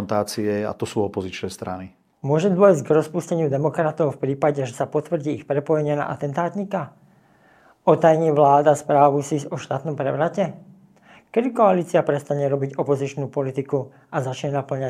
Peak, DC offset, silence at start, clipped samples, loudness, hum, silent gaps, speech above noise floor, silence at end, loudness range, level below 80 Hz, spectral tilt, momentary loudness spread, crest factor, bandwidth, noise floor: -2 dBFS; under 0.1%; 0 s; under 0.1%; -21 LUFS; none; none; 34 dB; 0 s; 5 LU; -66 dBFS; -7 dB/octave; 12 LU; 20 dB; 15 kHz; -55 dBFS